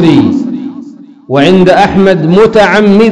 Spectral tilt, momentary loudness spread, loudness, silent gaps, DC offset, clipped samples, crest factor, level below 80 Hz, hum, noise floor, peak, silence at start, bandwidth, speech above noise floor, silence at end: -7 dB/octave; 13 LU; -6 LUFS; none; under 0.1%; 10%; 6 dB; -36 dBFS; none; -28 dBFS; 0 dBFS; 0 s; 11 kHz; 23 dB; 0 s